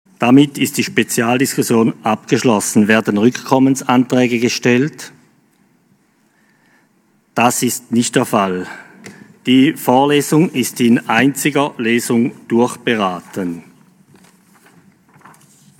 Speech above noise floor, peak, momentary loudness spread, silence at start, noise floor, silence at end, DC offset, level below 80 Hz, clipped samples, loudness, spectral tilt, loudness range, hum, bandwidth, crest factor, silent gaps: 43 dB; 0 dBFS; 11 LU; 0.2 s; -57 dBFS; 2.2 s; under 0.1%; -66 dBFS; under 0.1%; -15 LUFS; -4.5 dB/octave; 7 LU; none; 17.5 kHz; 16 dB; none